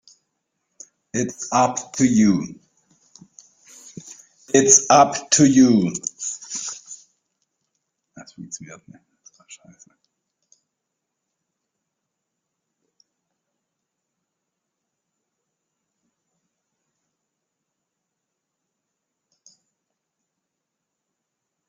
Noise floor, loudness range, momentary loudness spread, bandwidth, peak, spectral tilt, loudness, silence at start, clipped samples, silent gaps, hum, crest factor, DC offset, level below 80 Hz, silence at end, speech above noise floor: -81 dBFS; 17 LU; 27 LU; 10 kHz; 0 dBFS; -4 dB/octave; -17 LUFS; 1.15 s; under 0.1%; none; none; 24 dB; under 0.1%; -62 dBFS; 12.15 s; 63 dB